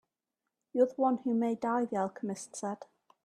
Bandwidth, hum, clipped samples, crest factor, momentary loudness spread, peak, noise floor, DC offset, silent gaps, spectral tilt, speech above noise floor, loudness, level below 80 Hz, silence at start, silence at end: 11 kHz; none; under 0.1%; 18 dB; 11 LU; -14 dBFS; -88 dBFS; under 0.1%; none; -6 dB/octave; 57 dB; -32 LUFS; -80 dBFS; 0.75 s; 0.4 s